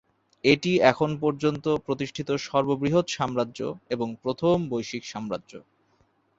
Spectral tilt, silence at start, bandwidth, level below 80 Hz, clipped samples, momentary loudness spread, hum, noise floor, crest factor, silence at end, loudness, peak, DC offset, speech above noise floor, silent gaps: -5.5 dB/octave; 0.45 s; 8 kHz; -58 dBFS; under 0.1%; 12 LU; none; -66 dBFS; 24 dB; 0.8 s; -26 LUFS; -2 dBFS; under 0.1%; 41 dB; none